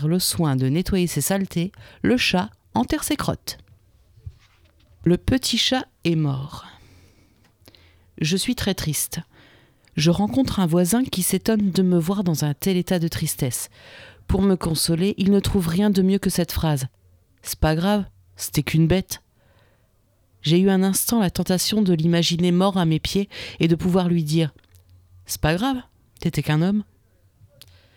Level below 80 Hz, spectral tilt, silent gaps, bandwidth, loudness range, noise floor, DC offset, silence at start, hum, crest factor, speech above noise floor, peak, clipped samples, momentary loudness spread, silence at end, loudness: -40 dBFS; -5 dB/octave; none; 19.5 kHz; 5 LU; -61 dBFS; under 0.1%; 0 s; none; 16 dB; 41 dB; -6 dBFS; under 0.1%; 10 LU; 1.15 s; -21 LUFS